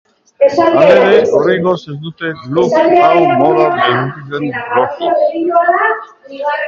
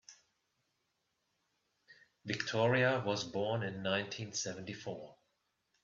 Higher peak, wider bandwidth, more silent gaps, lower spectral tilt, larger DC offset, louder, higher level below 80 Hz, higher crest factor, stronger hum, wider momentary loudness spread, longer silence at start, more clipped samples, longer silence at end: first, 0 dBFS vs -18 dBFS; about the same, 7.4 kHz vs 7.6 kHz; neither; first, -6.5 dB/octave vs -4.5 dB/octave; neither; first, -11 LUFS vs -36 LUFS; first, -54 dBFS vs -76 dBFS; second, 12 dB vs 20 dB; neither; about the same, 13 LU vs 15 LU; first, 0.4 s vs 0.1 s; neither; second, 0 s vs 0.7 s